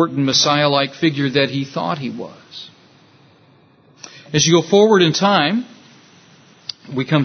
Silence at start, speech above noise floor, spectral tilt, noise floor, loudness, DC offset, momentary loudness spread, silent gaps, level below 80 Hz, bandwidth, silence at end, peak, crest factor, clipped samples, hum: 0 s; 35 dB; -4 dB/octave; -51 dBFS; -16 LUFS; under 0.1%; 20 LU; none; -60 dBFS; 6.6 kHz; 0 s; 0 dBFS; 18 dB; under 0.1%; none